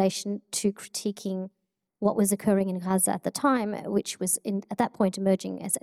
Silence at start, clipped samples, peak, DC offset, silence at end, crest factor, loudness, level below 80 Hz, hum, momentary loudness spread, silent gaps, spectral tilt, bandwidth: 0 s; under 0.1%; -10 dBFS; under 0.1%; 0.05 s; 18 dB; -27 LUFS; -66 dBFS; none; 8 LU; none; -4.5 dB/octave; 16 kHz